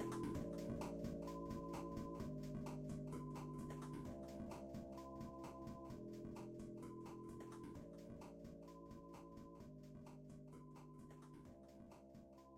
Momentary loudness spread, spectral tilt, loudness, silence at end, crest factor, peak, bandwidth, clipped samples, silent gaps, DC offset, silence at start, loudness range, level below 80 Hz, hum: 12 LU; -7 dB/octave; -53 LUFS; 0 s; 16 dB; -36 dBFS; 16 kHz; under 0.1%; none; under 0.1%; 0 s; 10 LU; -66 dBFS; none